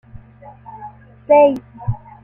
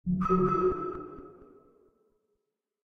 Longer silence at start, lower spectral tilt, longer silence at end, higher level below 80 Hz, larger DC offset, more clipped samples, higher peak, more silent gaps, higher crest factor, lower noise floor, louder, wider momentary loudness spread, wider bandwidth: first, 0.7 s vs 0.05 s; about the same, -9.5 dB/octave vs -10.5 dB/octave; second, 0.3 s vs 1.4 s; first, -42 dBFS vs -50 dBFS; neither; neither; first, -2 dBFS vs -14 dBFS; neither; about the same, 16 dB vs 18 dB; second, -41 dBFS vs -83 dBFS; first, -16 LUFS vs -28 LUFS; first, 25 LU vs 20 LU; second, 3.2 kHz vs 6.4 kHz